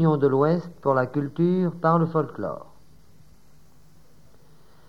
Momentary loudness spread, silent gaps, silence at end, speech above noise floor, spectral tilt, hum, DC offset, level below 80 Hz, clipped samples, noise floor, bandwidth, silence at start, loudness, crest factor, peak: 11 LU; none; 2.25 s; 34 dB; -10 dB/octave; none; 0.4%; -62 dBFS; under 0.1%; -57 dBFS; 6 kHz; 0 s; -23 LUFS; 18 dB; -8 dBFS